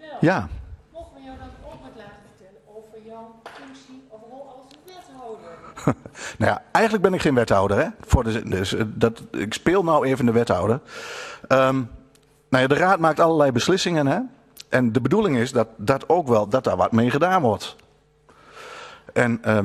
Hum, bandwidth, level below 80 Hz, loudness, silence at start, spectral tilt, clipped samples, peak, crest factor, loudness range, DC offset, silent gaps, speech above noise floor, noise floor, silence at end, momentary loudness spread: none; 14 kHz; -42 dBFS; -21 LUFS; 0.05 s; -6 dB/octave; under 0.1%; -2 dBFS; 20 dB; 10 LU; under 0.1%; none; 36 dB; -56 dBFS; 0 s; 23 LU